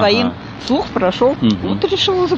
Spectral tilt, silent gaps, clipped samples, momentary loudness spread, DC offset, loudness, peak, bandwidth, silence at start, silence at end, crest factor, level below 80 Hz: -5.5 dB/octave; none; under 0.1%; 5 LU; under 0.1%; -16 LUFS; -2 dBFS; 7.8 kHz; 0 s; 0 s; 12 dB; -44 dBFS